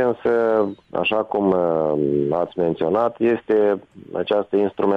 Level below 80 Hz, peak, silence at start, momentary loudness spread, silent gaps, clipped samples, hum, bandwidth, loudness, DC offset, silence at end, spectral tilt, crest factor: -58 dBFS; -8 dBFS; 0 s; 4 LU; none; under 0.1%; none; 5.4 kHz; -20 LUFS; under 0.1%; 0 s; -8.5 dB/octave; 12 dB